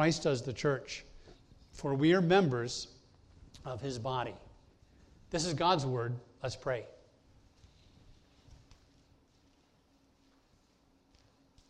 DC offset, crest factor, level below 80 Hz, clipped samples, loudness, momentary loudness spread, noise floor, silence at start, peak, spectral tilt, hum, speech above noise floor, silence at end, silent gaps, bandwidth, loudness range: under 0.1%; 22 dB; -62 dBFS; under 0.1%; -33 LUFS; 17 LU; -69 dBFS; 0 s; -14 dBFS; -5.5 dB/octave; none; 37 dB; 3.55 s; none; 11 kHz; 11 LU